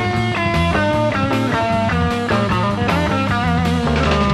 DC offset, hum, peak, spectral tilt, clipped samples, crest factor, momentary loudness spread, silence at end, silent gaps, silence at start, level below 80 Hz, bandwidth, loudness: under 0.1%; none; -4 dBFS; -6.5 dB/octave; under 0.1%; 12 dB; 2 LU; 0 s; none; 0 s; -30 dBFS; 13.5 kHz; -17 LUFS